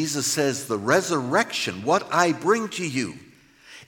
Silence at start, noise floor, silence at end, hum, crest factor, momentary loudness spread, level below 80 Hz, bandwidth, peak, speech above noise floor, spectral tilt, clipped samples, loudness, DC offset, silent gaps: 0 s; -49 dBFS; 0.05 s; none; 18 dB; 6 LU; -70 dBFS; 17 kHz; -6 dBFS; 26 dB; -3.5 dB/octave; under 0.1%; -23 LUFS; under 0.1%; none